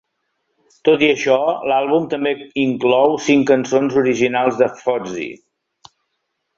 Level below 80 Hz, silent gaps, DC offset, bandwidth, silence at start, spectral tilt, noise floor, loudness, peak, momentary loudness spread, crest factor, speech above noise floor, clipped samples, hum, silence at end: -60 dBFS; none; under 0.1%; 7.6 kHz; 0.85 s; -5 dB/octave; -73 dBFS; -17 LUFS; -2 dBFS; 7 LU; 16 dB; 57 dB; under 0.1%; none; 1.25 s